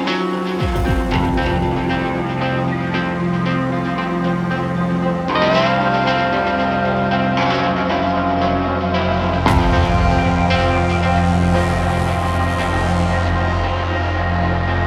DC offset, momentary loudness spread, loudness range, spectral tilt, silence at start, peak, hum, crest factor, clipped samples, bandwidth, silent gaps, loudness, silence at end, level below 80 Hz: under 0.1%; 4 LU; 3 LU; -7 dB/octave; 0 s; 0 dBFS; none; 16 dB; under 0.1%; 12.5 kHz; none; -18 LUFS; 0 s; -28 dBFS